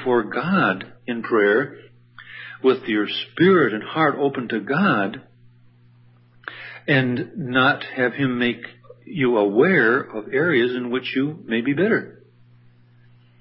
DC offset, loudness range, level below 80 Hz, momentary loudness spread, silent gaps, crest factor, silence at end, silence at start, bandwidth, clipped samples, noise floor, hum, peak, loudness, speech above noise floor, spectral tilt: under 0.1%; 4 LU; -66 dBFS; 16 LU; none; 18 dB; 1.3 s; 0 s; 5.8 kHz; under 0.1%; -52 dBFS; none; -4 dBFS; -20 LUFS; 32 dB; -11 dB/octave